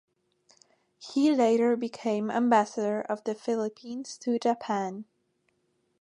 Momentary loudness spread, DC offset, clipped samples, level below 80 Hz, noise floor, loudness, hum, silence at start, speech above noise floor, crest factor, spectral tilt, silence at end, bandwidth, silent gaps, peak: 13 LU; under 0.1%; under 0.1%; -80 dBFS; -74 dBFS; -28 LUFS; none; 1 s; 46 dB; 20 dB; -5.5 dB/octave; 1 s; 10.5 kHz; none; -10 dBFS